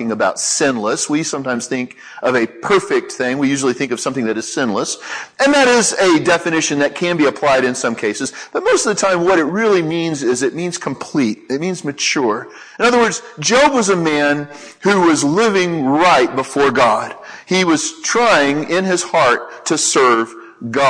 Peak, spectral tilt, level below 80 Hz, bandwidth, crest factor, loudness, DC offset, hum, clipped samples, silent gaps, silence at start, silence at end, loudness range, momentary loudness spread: -2 dBFS; -3.5 dB/octave; -56 dBFS; 11 kHz; 14 dB; -15 LUFS; under 0.1%; none; under 0.1%; none; 0 s; 0 s; 4 LU; 10 LU